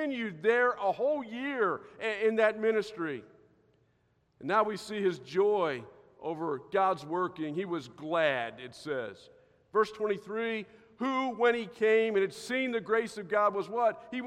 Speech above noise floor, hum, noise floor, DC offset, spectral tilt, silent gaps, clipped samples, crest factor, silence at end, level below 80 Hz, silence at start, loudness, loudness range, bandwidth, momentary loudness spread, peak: 41 dB; none; -72 dBFS; under 0.1%; -5 dB/octave; none; under 0.1%; 18 dB; 0 s; -76 dBFS; 0 s; -31 LUFS; 4 LU; 12 kHz; 10 LU; -12 dBFS